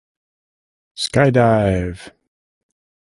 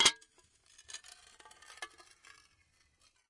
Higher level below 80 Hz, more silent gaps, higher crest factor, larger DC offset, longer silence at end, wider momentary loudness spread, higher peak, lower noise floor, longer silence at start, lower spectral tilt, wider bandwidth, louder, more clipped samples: first, -40 dBFS vs -74 dBFS; neither; second, 18 dB vs 30 dB; neither; second, 0.95 s vs 1.45 s; about the same, 14 LU vs 12 LU; first, -2 dBFS vs -10 dBFS; first, under -90 dBFS vs -72 dBFS; first, 0.95 s vs 0 s; first, -6 dB/octave vs 1.5 dB/octave; about the same, 11.5 kHz vs 11.5 kHz; first, -16 LUFS vs -38 LUFS; neither